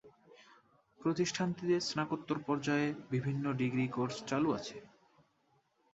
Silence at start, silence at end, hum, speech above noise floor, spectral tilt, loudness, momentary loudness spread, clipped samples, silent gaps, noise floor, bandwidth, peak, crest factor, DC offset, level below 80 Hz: 0.05 s; 1.05 s; none; 40 dB; -5.5 dB/octave; -35 LUFS; 5 LU; under 0.1%; none; -74 dBFS; 8.2 kHz; -18 dBFS; 18 dB; under 0.1%; -72 dBFS